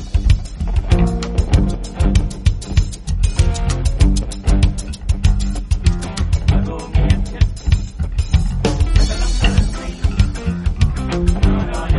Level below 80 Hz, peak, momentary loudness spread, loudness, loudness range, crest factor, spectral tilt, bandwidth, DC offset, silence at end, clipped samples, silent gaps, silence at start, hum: -18 dBFS; -2 dBFS; 5 LU; -18 LUFS; 1 LU; 14 dB; -6 dB/octave; 11.5 kHz; under 0.1%; 0 s; under 0.1%; none; 0 s; none